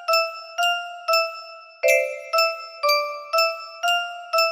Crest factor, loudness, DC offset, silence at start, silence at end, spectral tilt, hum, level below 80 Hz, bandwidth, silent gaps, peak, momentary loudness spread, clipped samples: 18 dB; -22 LUFS; under 0.1%; 0 s; 0 s; 3 dB/octave; none; -78 dBFS; 15.5 kHz; none; -6 dBFS; 7 LU; under 0.1%